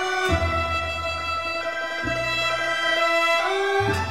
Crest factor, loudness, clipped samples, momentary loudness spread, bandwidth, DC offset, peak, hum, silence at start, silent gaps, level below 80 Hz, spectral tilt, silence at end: 14 dB; -22 LUFS; under 0.1%; 7 LU; 16.5 kHz; 0.4%; -10 dBFS; none; 0 s; none; -40 dBFS; -4 dB/octave; 0 s